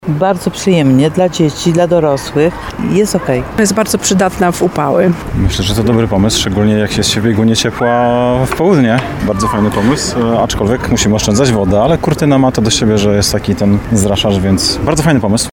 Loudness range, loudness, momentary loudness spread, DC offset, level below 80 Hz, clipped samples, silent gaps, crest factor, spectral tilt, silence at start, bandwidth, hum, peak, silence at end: 1 LU; -12 LUFS; 3 LU; 0.3%; -28 dBFS; under 0.1%; none; 12 dB; -5 dB/octave; 0.05 s; 18 kHz; none; 0 dBFS; 0 s